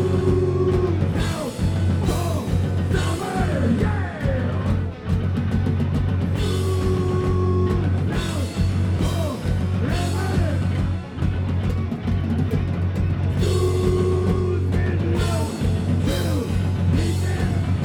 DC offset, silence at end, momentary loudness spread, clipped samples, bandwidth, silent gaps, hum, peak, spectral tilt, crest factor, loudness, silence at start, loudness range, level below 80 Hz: under 0.1%; 0 s; 4 LU; under 0.1%; 13.5 kHz; none; none; -10 dBFS; -7 dB/octave; 12 dB; -22 LUFS; 0 s; 2 LU; -32 dBFS